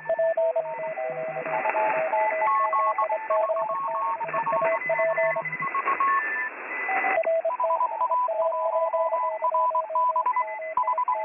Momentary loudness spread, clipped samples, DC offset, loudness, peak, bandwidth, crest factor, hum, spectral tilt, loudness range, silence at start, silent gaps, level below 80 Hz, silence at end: 6 LU; under 0.1%; under 0.1%; -25 LUFS; -8 dBFS; 3.6 kHz; 18 dB; none; -7.5 dB/octave; 1 LU; 0 s; none; -78 dBFS; 0 s